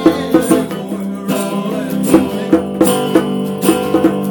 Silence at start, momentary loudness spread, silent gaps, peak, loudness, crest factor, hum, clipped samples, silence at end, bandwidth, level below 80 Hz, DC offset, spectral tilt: 0 s; 7 LU; none; 0 dBFS; -15 LUFS; 14 dB; none; 0.2%; 0 s; 19.5 kHz; -46 dBFS; under 0.1%; -5.5 dB/octave